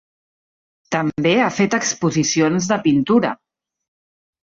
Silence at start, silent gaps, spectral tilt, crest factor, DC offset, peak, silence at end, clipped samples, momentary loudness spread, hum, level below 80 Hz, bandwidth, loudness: 0.9 s; none; -4.5 dB/octave; 16 dB; under 0.1%; -4 dBFS; 1.1 s; under 0.1%; 7 LU; none; -58 dBFS; 7.8 kHz; -18 LUFS